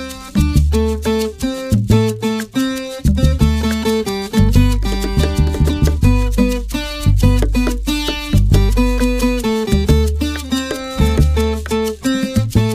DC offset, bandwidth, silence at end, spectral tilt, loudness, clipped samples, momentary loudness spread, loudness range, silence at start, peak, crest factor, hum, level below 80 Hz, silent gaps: under 0.1%; 15.5 kHz; 0 s; -6 dB/octave; -16 LUFS; under 0.1%; 6 LU; 1 LU; 0 s; 0 dBFS; 14 dB; none; -18 dBFS; none